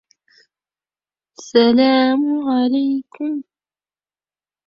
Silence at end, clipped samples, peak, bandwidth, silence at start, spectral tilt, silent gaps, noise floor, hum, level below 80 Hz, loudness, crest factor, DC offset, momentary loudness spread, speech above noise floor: 1.25 s; under 0.1%; -2 dBFS; 7.4 kHz; 1.4 s; -4.5 dB/octave; none; under -90 dBFS; 50 Hz at -70 dBFS; -64 dBFS; -17 LUFS; 18 dB; under 0.1%; 12 LU; over 74 dB